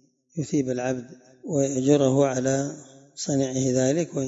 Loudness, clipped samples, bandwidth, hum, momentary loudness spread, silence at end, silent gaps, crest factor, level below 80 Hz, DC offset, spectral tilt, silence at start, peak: -24 LUFS; under 0.1%; 8 kHz; none; 15 LU; 0 s; none; 18 dB; -66 dBFS; under 0.1%; -5.5 dB/octave; 0.35 s; -6 dBFS